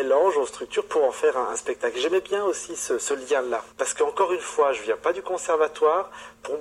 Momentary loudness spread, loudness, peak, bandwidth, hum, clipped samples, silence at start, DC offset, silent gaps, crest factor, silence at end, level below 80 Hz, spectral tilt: 7 LU; -24 LUFS; -8 dBFS; 13 kHz; none; under 0.1%; 0 s; under 0.1%; none; 16 dB; 0 s; -64 dBFS; -1.5 dB/octave